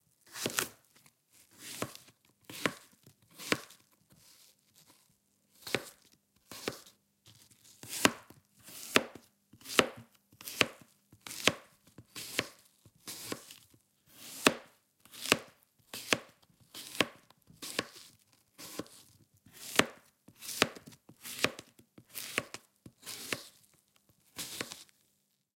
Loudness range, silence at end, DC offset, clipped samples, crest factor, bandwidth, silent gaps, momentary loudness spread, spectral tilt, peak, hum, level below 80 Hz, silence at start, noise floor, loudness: 8 LU; 0.75 s; under 0.1%; under 0.1%; 36 dB; 16.5 kHz; none; 22 LU; -2 dB/octave; -2 dBFS; none; -76 dBFS; 0.3 s; -76 dBFS; -35 LUFS